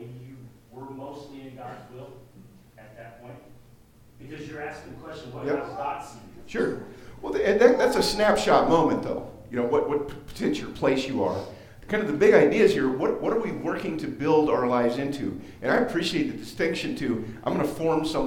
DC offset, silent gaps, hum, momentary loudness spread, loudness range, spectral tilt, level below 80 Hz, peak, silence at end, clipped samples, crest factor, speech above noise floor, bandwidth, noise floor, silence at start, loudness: under 0.1%; none; none; 23 LU; 20 LU; -5.5 dB/octave; -52 dBFS; -4 dBFS; 0 s; under 0.1%; 22 dB; 29 dB; 17 kHz; -53 dBFS; 0 s; -25 LUFS